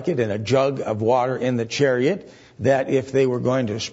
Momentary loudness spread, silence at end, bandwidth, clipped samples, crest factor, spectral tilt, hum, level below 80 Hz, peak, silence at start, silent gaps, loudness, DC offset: 4 LU; 0 s; 8 kHz; under 0.1%; 14 dB; -6 dB/octave; none; -58 dBFS; -6 dBFS; 0 s; none; -21 LUFS; under 0.1%